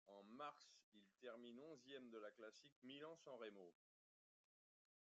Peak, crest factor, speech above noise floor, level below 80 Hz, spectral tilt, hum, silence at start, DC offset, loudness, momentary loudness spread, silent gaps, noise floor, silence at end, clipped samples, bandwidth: -44 dBFS; 18 dB; over 30 dB; under -90 dBFS; -2.5 dB/octave; none; 0.05 s; under 0.1%; -61 LUFS; 9 LU; 0.83-0.92 s, 2.72-2.82 s; under -90 dBFS; 1.35 s; under 0.1%; 7.6 kHz